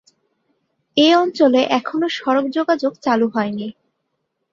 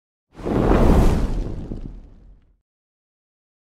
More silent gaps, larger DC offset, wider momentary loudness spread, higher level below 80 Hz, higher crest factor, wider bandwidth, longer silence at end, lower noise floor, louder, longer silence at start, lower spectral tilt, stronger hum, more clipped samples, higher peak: neither; neither; second, 9 LU vs 19 LU; second, -66 dBFS vs -24 dBFS; about the same, 18 dB vs 18 dB; second, 7.6 kHz vs 13.5 kHz; second, 0.8 s vs 1.6 s; first, -73 dBFS vs -48 dBFS; first, -17 LUFS vs -20 LUFS; first, 0.95 s vs 0.35 s; second, -5 dB/octave vs -8 dB/octave; neither; neither; about the same, -2 dBFS vs -4 dBFS